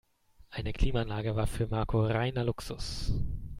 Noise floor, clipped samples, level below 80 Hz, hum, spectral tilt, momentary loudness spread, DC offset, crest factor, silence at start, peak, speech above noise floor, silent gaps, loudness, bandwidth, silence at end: -60 dBFS; under 0.1%; -38 dBFS; none; -6.5 dB/octave; 9 LU; under 0.1%; 18 dB; 0.5 s; -12 dBFS; 30 dB; none; -33 LUFS; 15 kHz; 0 s